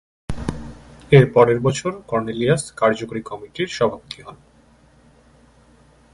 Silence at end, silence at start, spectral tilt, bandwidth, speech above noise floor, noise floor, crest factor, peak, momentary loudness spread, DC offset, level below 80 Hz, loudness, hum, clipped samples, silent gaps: 1.8 s; 0.3 s; -6 dB/octave; 11.5 kHz; 34 dB; -53 dBFS; 20 dB; 0 dBFS; 20 LU; under 0.1%; -44 dBFS; -19 LUFS; none; under 0.1%; none